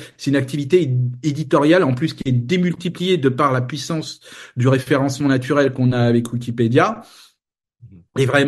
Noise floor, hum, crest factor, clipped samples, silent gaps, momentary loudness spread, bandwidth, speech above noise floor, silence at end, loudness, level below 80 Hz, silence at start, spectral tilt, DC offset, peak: -72 dBFS; none; 18 dB; under 0.1%; none; 9 LU; 12.5 kHz; 54 dB; 0 s; -18 LUFS; -56 dBFS; 0 s; -6.5 dB/octave; under 0.1%; 0 dBFS